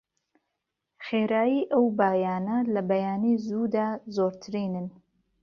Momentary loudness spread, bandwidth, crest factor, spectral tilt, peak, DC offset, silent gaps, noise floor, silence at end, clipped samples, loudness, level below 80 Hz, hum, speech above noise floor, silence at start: 9 LU; 6.6 kHz; 18 dB; -8 dB/octave; -10 dBFS; under 0.1%; none; -83 dBFS; 0.5 s; under 0.1%; -27 LUFS; -70 dBFS; none; 57 dB; 1 s